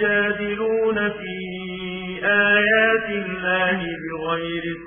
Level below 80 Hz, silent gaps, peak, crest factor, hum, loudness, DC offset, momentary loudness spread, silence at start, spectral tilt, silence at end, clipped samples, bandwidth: -52 dBFS; none; -4 dBFS; 16 dB; none; -21 LUFS; under 0.1%; 14 LU; 0 s; -8.5 dB/octave; 0 s; under 0.1%; 3.6 kHz